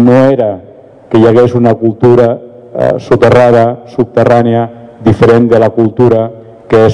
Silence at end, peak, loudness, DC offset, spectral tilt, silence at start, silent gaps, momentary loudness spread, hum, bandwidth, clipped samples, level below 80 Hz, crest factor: 0 s; 0 dBFS; -8 LUFS; under 0.1%; -8.5 dB/octave; 0 s; none; 9 LU; none; 11 kHz; 8%; -40 dBFS; 8 dB